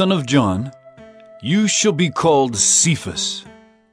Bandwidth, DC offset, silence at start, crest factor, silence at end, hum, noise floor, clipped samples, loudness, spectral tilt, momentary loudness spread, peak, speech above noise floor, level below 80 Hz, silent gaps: 11 kHz; under 0.1%; 0 s; 16 dB; 0.45 s; none; -43 dBFS; under 0.1%; -16 LUFS; -3.5 dB/octave; 13 LU; -2 dBFS; 26 dB; -54 dBFS; none